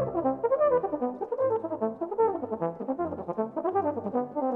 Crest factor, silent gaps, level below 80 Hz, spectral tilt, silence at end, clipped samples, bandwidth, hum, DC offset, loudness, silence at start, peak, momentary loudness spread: 14 dB; none; -64 dBFS; -11 dB/octave; 0 s; under 0.1%; 3.3 kHz; none; under 0.1%; -29 LUFS; 0 s; -14 dBFS; 7 LU